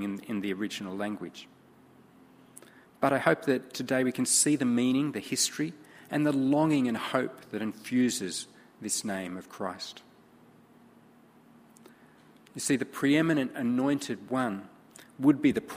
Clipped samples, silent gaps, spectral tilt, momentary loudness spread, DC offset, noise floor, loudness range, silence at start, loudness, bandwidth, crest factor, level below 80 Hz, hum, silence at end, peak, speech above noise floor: under 0.1%; none; -4 dB/octave; 13 LU; under 0.1%; -58 dBFS; 11 LU; 0 s; -29 LUFS; 15.5 kHz; 24 dB; -70 dBFS; none; 0 s; -6 dBFS; 29 dB